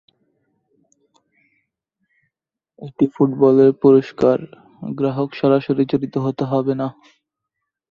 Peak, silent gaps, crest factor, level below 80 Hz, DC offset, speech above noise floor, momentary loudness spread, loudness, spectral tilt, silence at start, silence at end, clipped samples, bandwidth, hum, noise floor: -2 dBFS; none; 18 dB; -60 dBFS; under 0.1%; 65 dB; 15 LU; -17 LUFS; -9.5 dB/octave; 2.8 s; 1 s; under 0.1%; 6.8 kHz; none; -82 dBFS